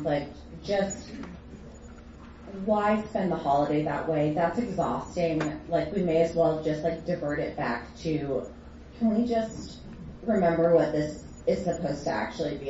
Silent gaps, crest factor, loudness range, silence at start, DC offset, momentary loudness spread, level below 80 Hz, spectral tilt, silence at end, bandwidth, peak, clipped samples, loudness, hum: none; 18 dB; 3 LU; 0 s; under 0.1%; 19 LU; -50 dBFS; -6.5 dB/octave; 0 s; 8 kHz; -10 dBFS; under 0.1%; -28 LUFS; none